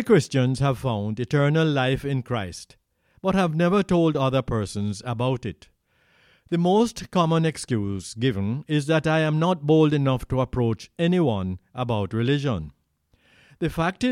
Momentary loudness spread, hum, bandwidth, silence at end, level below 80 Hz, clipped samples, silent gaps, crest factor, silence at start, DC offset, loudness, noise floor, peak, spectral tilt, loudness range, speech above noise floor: 9 LU; none; 13.5 kHz; 0 s; -48 dBFS; under 0.1%; none; 18 dB; 0 s; under 0.1%; -23 LUFS; -65 dBFS; -6 dBFS; -6.5 dB/octave; 3 LU; 43 dB